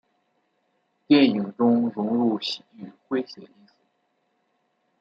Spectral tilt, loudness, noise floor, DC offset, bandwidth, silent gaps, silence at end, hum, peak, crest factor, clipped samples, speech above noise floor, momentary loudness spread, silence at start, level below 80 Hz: -6.5 dB/octave; -23 LUFS; -72 dBFS; under 0.1%; 7.6 kHz; none; 1.55 s; none; -6 dBFS; 20 dB; under 0.1%; 49 dB; 19 LU; 1.1 s; -74 dBFS